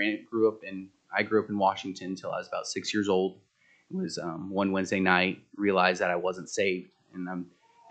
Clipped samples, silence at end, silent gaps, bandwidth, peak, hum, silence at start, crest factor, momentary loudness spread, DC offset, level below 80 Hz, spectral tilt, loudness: under 0.1%; 0.45 s; none; 9 kHz; -6 dBFS; none; 0 s; 24 dB; 15 LU; under 0.1%; -74 dBFS; -4.5 dB/octave; -29 LUFS